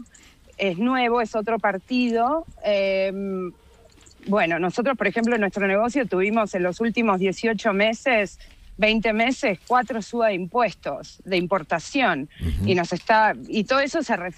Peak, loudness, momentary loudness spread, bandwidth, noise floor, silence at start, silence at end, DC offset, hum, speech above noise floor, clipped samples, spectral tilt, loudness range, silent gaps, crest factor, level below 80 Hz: -6 dBFS; -22 LUFS; 6 LU; 12 kHz; -51 dBFS; 0 s; 0.05 s; under 0.1%; none; 29 dB; under 0.1%; -5.5 dB/octave; 2 LU; none; 18 dB; -44 dBFS